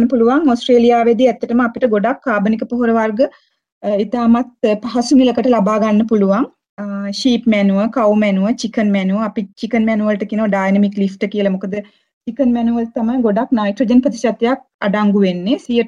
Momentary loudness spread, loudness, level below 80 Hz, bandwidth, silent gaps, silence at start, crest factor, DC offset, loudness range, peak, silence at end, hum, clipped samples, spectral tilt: 7 LU; -15 LUFS; -52 dBFS; 10 kHz; 3.72-3.81 s, 6.69-6.77 s, 12.13-12.21 s, 14.74-14.79 s; 0 s; 12 dB; under 0.1%; 3 LU; -2 dBFS; 0 s; none; under 0.1%; -6.5 dB/octave